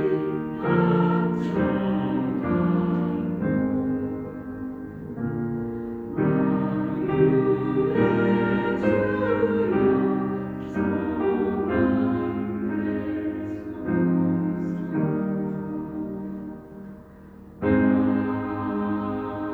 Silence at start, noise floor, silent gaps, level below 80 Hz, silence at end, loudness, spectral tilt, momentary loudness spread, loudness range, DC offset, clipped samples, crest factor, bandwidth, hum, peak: 0 s; -45 dBFS; none; -52 dBFS; 0 s; -25 LUFS; -10 dB/octave; 11 LU; 5 LU; under 0.1%; under 0.1%; 16 dB; 4.6 kHz; none; -8 dBFS